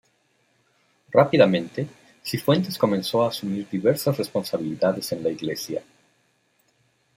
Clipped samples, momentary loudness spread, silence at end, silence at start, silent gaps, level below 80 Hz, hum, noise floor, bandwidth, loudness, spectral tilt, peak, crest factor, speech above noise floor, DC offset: under 0.1%; 13 LU; 1.35 s; 1.1 s; none; -66 dBFS; none; -66 dBFS; 16 kHz; -23 LUFS; -6 dB/octave; -4 dBFS; 22 dB; 44 dB; under 0.1%